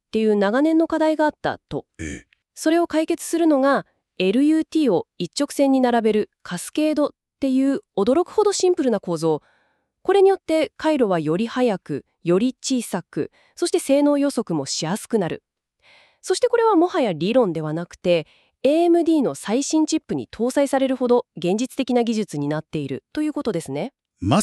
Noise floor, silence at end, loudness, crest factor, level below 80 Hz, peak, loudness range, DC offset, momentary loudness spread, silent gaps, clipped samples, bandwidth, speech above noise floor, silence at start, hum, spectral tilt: -66 dBFS; 0 s; -21 LUFS; 18 dB; -58 dBFS; -4 dBFS; 3 LU; under 0.1%; 11 LU; none; under 0.1%; 13 kHz; 46 dB; 0.15 s; none; -5 dB/octave